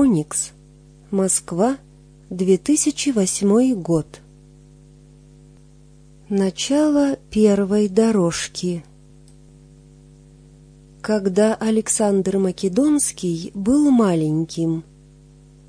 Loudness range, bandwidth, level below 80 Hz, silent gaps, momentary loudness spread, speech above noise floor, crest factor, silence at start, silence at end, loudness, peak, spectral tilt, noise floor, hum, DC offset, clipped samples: 6 LU; 10.5 kHz; -50 dBFS; none; 9 LU; 29 dB; 16 dB; 0 s; 0.85 s; -19 LUFS; -4 dBFS; -5 dB/octave; -48 dBFS; none; under 0.1%; under 0.1%